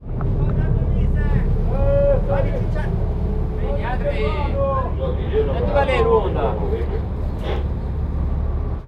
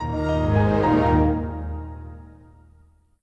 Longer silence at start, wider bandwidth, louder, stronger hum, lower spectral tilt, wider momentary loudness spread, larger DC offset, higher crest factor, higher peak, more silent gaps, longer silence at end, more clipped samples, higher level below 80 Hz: about the same, 0 s vs 0 s; second, 5.2 kHz vs 7.8 kHz; about the same, -21 LUFS vs -21 LUFS; neither; about the same, -9 dB/octave vs -9 dB/octave; second, 7 LU vs 19 LU; neither; about the same, 14 dB vs 14 dB; first, -4 dBFS vs -8 dBFS; neither; second, 0 s vs 0.95 s; neither; first, -22 dBFS vs -32 dBFS